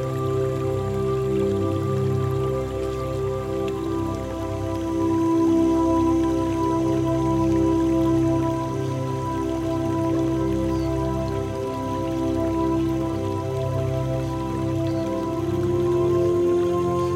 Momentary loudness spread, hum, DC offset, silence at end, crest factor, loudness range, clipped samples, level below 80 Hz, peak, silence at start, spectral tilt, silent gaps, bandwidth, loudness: 6 LU; none; under 0.1%; 0 s; 12 dB; 4 LU; under 0.1%; -38 dBFS; -10 dBFS; 0 s; -8 dB/octave; none; 13.5 kHz; -23 LUFS